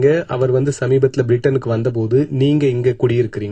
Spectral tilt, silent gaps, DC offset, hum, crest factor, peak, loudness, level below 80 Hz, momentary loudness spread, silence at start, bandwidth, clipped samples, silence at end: -8 dB/octave; none; under 0.1%; none; 14 dB; -2 dBFS; -16 LUFS; -48 dBFS; 3 LU; 0 s; 9 kHz; under 0.1%; 0 s